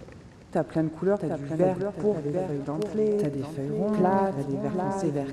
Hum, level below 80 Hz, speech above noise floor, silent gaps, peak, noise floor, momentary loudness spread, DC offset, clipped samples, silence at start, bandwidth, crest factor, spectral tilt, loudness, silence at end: none; -56 dBFS; 21 dB; none; -10 dBFS; -47 dBFS; 7 LU; under 0.1%; under 0.1%; 0 s; 12.5 kHz; 16 dB; -8.5 dB/octave; -27 LUFS; 0 s